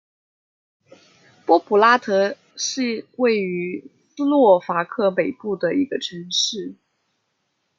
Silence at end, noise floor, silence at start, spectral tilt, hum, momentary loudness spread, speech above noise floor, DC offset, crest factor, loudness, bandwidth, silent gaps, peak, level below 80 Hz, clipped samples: 1.05 s; -72 dBFS; 1.5 s; -3.5 dB/octave; none; 12 LU; 53 dB; under 0.1%; 20 dB; -20 LUFS; 7.8 kHz; none; -2 dBFS; -74 dBFS; under 0.1%